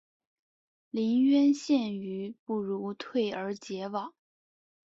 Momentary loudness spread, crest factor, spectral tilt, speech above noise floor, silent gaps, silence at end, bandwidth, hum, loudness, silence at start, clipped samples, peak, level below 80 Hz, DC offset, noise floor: 14 LU; 14 dB; -6 dB/octave; over 61 dB; 2.39-2.46 s; 0.75 s; 7.8 kHz; none; -30 LUFS; 0.95 s; under 0.1%; -16 dBFS; -76 dBFS; under 0.1%; under -90 dBFS